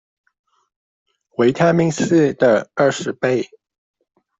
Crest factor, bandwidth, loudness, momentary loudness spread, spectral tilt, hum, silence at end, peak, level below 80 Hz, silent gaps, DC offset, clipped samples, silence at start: 16 dB; 8 kHz; -17 LUFS; 8 LU; -6 dB/octave; none; 0.95 s; -2 dBFS; -58 dBFS; none; under 0.1%; under 0.1%; 1.4 s